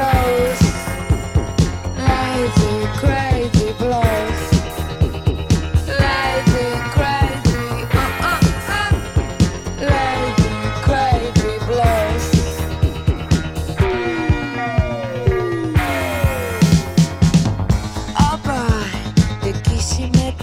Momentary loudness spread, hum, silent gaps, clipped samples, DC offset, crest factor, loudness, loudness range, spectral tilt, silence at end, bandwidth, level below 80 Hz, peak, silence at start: 5 LU; none; none; under 0.1%; under 0.1%; 16 dB; -18 LUFS; 2 LU; -6 dB/octave; 0 s; 16.5 kHz; -24 dBFS; 0 dBFS; 0 s